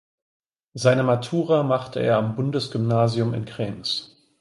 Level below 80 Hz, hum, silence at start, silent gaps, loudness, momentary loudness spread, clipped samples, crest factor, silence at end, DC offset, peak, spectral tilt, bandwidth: -58 dBFS; none; 0.75 s; none; -23 LUFS; 8 LU; under 0.1%; 18 dB; 0.35 s; under 0.1%; -4 dBFS; -6.5 dB/octave; 11.5 kHz